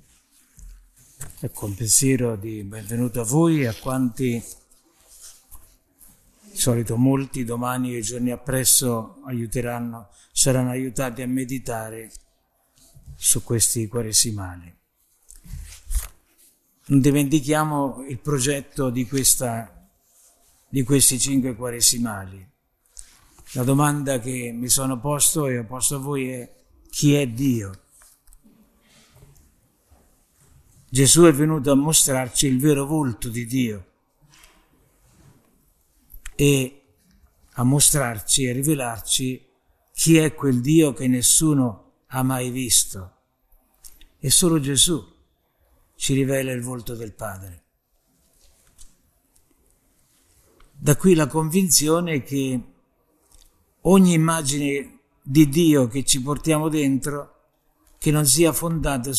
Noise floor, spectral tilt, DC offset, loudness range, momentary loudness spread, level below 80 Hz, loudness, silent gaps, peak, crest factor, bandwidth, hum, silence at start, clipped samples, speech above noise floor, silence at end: -67 dBFS; -4 dB/octave; under 0.1%; 9 LU; 16 LU; -44 dBFS; -20 LUFS; none; -2 dBFS; 22 dB; 14 kHz; none; 0.6 s; under 0.1%; 47 dB; 0 s